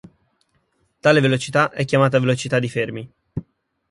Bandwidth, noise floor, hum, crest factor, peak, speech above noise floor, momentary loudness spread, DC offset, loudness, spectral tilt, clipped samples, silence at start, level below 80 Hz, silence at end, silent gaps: 11.5 kHz; -66 dBFS; none; 20 dB; -2 dBFS; 48 dB; 18 LU; under 0.1%; -19 LUFS; -6 dB/octave; under 0.1%; 1.05 s; -54 dBFS; 0.5 s; none